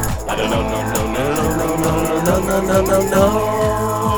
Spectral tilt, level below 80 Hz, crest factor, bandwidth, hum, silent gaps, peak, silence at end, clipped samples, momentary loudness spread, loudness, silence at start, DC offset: -5 dB/octave; -30 dBFS; 14 dB; over 20 kHz; none; none; -2 dBFS; 0 s; under 0.1%; 5 LU; -17 LUFS; 0 s; under 0.1%